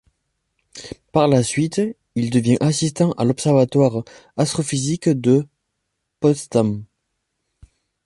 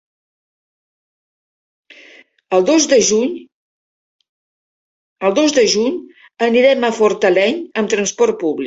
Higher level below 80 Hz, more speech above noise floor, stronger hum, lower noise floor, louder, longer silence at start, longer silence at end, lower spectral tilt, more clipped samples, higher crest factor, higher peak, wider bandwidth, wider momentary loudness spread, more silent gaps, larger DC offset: first, -54 dBFS vs -62 dBFS; first, 58 dB vs 32 dB; neither; first, -76 dBFS vs -46 dBFS; second, -19 LUFS vs -15 LUFS; second, 0.75 s vs 2.5 s; first, 1.2 s vs 0 s; first, -6 dB/octave vs -3 dB/octave; neither; about the same, 18 dB vs 16 dB; about the same, -2 dBFS vs -2 dBFS; first, 11.5 kHz vs 8 kHz; first, 13 LU vs 8 LU; second, none vs 3.52-4.19 s, 4.29-5.16 s; neither